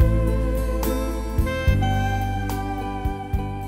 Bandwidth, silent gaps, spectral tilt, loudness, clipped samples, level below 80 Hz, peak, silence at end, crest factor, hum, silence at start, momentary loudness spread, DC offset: 16 kHz; none; -6.5 dB/octave; -24 LUFS; under 0.1%; -26 dBFS; -6 dBFS; 0 s; 16 dB; none; 0 s; 7 LU; under 0.1%